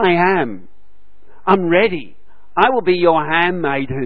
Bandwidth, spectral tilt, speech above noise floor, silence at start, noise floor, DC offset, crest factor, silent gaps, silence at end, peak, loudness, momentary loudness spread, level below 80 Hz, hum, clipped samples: 5.4 kHz; -9 dB/octave; 42 dB; 0 s; -57 dBFS; 4%; 16 dB; none; 0 s; 0 dBFS; -16 LUFS; 11 LU; -52 dBFS; none; under 0.1%